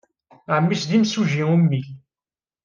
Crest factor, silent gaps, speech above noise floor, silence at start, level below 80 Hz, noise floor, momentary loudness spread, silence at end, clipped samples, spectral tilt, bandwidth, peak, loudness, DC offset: 14 dB; none; over 71 dB; 0.5 s; -66 dBFS; under -90 dBFS; 7 LU; 0.65 s; under 0.1%; -6.5 dB/octave; 7.4 kHz; -6 dBFS; -20 LUFS; under 0.1%